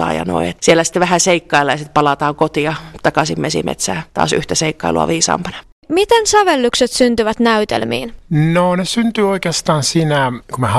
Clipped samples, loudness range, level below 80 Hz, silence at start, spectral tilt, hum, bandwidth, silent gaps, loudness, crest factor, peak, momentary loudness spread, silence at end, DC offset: under 0.1%; 3 LU; -42 dBFS; 0 s; -4 dB/octave; none; 15 kHz; 5.72-5.82 s; -15 LUFS; 14 dB; 0 dBFS; 7 LU; 0 s; under 0.1%